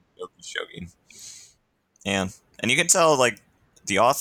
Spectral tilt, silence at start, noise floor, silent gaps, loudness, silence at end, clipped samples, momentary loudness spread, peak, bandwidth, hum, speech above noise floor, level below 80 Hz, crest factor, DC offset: -2.5 dB/octave; 0.2 s; -66 dBFS; none; -22 LUFS; 0 s; under 0.1%; 24 LU; -4 dBFS; 19 kHz; none; 44 dB; -62 dBFS; 20 dB; under 0.1%